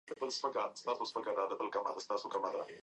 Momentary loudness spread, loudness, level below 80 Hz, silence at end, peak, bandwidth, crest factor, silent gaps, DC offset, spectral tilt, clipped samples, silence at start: 3 LU; -38 LUFS; -90 dBFS; 0.05 s; -22 dBFS; 10 kHz; 18 dB; none; under 0.1%; -2.5 dB/octave; under 0.1%; 0.05 s